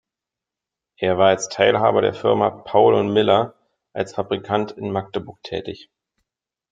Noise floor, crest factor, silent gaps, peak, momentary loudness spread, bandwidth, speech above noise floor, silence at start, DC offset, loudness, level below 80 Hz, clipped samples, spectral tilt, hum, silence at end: -87 dBFS; 18 dB; none; -2 dBFS; 15 LU; 9.2 kHz; 68 dB; 1 s; under 0.1%; -19 LUFS; -62 dBFS; under 0.1%; -5 dB/octave; none; 0.95 s